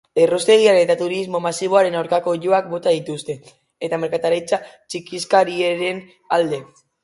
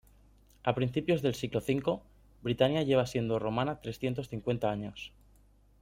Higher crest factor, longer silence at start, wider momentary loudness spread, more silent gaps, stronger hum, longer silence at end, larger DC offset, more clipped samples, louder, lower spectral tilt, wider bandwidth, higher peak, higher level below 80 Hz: about the same, 18 dB vs 22 dB; second, 0.15 s vs 0.65 s; first, 15 LU vs 10 LU; neither; second, none vs 50 Hz at -55 dBFS; second, 0.4 s vs 0.75 s; neither; neither; first, -19 LUFS vs -32 LUFS; second, -4 dB/octave vs -6.5 dB/octave; second, 11.5 kHz vs 16.5 kHz; first, 0 dBFS vs -12 dBFS; second, -66 dBFS vs -58 dBFS